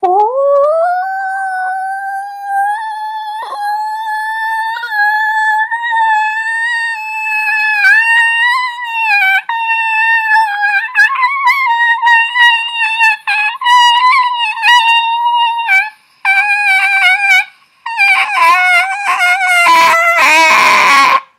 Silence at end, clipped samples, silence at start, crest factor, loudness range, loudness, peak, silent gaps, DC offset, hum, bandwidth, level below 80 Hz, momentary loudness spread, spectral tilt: 0.15 s; under 0.1%; 0 s; 12 dB; 7 LU; -10 LUFS; 0 dBFS; none; under 0.1%; none; 16.5 kHz; -72 dBFS; 11 LU; 0.5 dB/octave